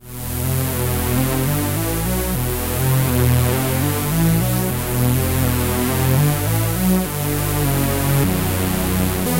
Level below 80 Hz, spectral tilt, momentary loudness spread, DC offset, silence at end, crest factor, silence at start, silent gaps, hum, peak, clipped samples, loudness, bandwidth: -30 dBFS; -5.5 dB/octave; 4 LU; 0.4%; 0 s; 14 dB; 0 s; none; none; -4 dBFS; under 0.1%; -19 LUFS; 16 kHz